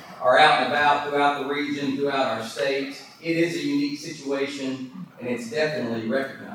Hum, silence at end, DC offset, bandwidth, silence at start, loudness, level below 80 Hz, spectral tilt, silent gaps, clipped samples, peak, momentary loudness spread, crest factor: none; 0 s; under 0.1%; 16 kHz; 0 s; -23 LUFS; -68 dBFS; -4.5 dB/octave; none; under 0.1%; -4 dBFS; 14 LU; 20 dB